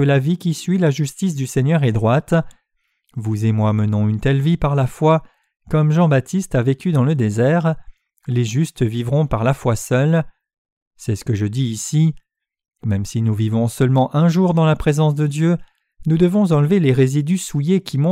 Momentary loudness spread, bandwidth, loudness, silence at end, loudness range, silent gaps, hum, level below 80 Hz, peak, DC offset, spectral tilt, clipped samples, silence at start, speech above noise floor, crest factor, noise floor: 7 LU; 14.5 kHz; -18 LUFS; 0 s; 4 LU; 10.58-10.65 s, 10.72-10.91 s; none; -42 dBFS; -4 dBFS; under 0.1%; -7 dB/octave; under 0.1%; 0 s; 51 dB; 14 dB; -68 dBFS